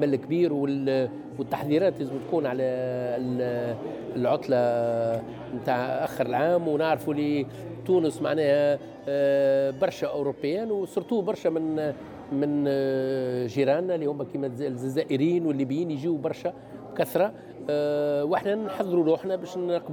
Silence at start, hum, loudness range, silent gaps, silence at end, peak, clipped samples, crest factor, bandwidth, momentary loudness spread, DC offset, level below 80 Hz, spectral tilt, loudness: 0 s; none; 3 LU; none; 0 s; -12 dBFS; under 0.1%; 14 dB; 19.5 kHz; 8 LU; under 0.1%; -66 dBFS; -7 dB/octave; -27 LUFS